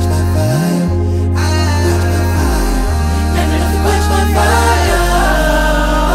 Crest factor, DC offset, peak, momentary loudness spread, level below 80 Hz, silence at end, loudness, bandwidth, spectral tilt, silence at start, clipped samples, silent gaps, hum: 10 dB; under 0.1%; 0 dBFS; 4 LU; -16 dBFS; 0 s; -13 LUFS; 16 kHz; -5.5 dB/octave; 0 s; under 0.1%; none; none